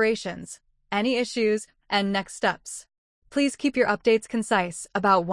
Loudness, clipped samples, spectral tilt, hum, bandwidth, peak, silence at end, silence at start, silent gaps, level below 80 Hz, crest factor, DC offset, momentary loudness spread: -25 LUFS; under 0.1%; -4 dB/octave; none; 12 kHz; -8 dBFS; 0 s; 0 s; 2.98-3.22 s; -60 dBFS; 18 dB; under 0.1%; 14 LU